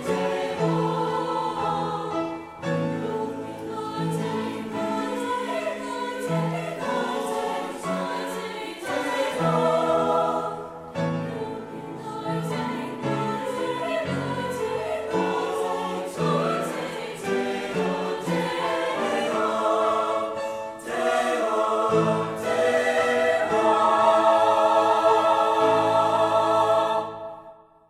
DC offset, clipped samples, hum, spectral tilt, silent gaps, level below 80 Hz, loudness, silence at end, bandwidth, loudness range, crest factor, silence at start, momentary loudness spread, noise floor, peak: under 0.1%; under 0.1%; none; -5.5 dB/octave; none; -62 dBFS; -25 LUFS; 0.35 s; 15.5 kHz; 9 LU; 18 dB; 0 s; 12 LU; -48 dBFS; -6 dBFS